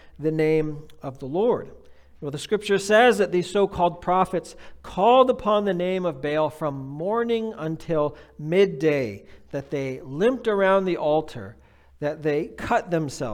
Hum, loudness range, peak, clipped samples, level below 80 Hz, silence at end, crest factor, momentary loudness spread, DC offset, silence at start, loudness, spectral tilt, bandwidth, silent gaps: none; 4 LU; -4 dBFS; under 0.1%; -52 dBFS; 0 s; 20 dB; 16 LU; under 0.1%; 0.05 s; -23 LUFS; -6 dB/octave; 15 kHz; none